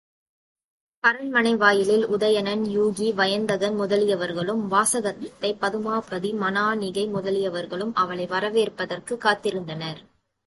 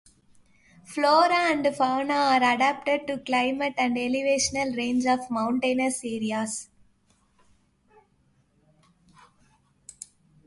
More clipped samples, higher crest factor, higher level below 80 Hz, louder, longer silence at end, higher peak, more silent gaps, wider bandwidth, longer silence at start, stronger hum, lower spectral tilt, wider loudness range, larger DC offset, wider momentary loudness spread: neither; about the same, 20 dB vs 18 dB; about the same, -66 dBFS vs -62 dBFS; about the same, -23 LUFS vs -24 LUFS; second, 0.45 s vs 3.8 s; first, -4 dBFS vs -8 dBFS; neither; about the same, 12 kHz vs 11.5 kHz; first, 1.05 s vs 0.9 s; neither; about the same, -4 dB/octave vs -3 dB/octave; second, 4 LU vs 11 LU; neither; about the same, 9 LU vs 11 LU